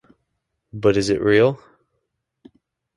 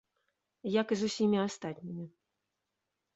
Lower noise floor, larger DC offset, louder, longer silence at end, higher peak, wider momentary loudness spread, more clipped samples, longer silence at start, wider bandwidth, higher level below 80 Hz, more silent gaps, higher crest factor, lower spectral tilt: second, -76 dBFS vs -86 dBFS; neither; first, -18 LUFS vs -33 LUFS; first, 1.4 s vs 1.1 s; first, -4 dBFS vs -18 dBFS; first, 19 LU vs 14 LU; neither; about the same, 0.75 s vs 0.65 s; first, 11.5 kHz vs 8.2 kHz; first, -52 dBFS vs -76 dBFS; neither; about the same, 18 dB vs 18 dB; about the same, -6 dB/octave vs -5.5 dB/octave